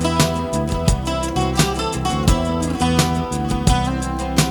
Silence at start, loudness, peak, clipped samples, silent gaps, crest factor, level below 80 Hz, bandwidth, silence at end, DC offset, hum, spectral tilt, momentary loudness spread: 0 s; -19 LUFS; -2 dBFS; under 0.1%; none; 16 dB; -26 dBFS; 17.5 kHz; 0 s; under 0.1%; none; -5 dB/octave; 4 LU